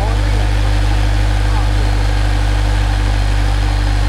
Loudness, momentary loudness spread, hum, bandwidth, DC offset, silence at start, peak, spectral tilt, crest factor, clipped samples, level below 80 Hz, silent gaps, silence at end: -16 LUFS; 1 LU; 50 Hz at -15 dBFS; 11.5 kHz; under 0.1%; 0 s; -4 dBFS; -5.5 dB/octave; 8 dB; under 0.1%; -14 dBFS; none; 0 s